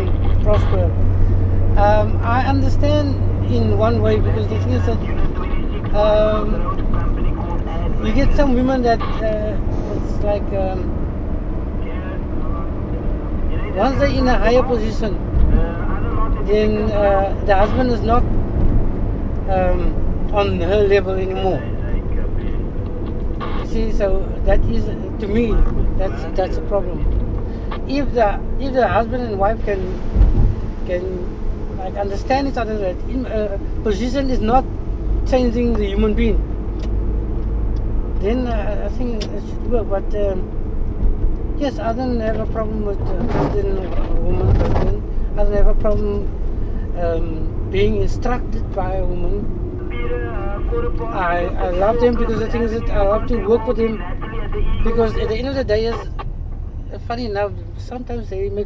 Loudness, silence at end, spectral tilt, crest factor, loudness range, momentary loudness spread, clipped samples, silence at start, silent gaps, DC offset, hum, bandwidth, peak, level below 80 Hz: -20 LUFS; 0 s; -8 dB/octave; 16 dB; 5 LU; 9 LU; under 0.1%; 0 s; none; 0.4%; none; 6.4 kHz; 0 dBFS; -20 dBFS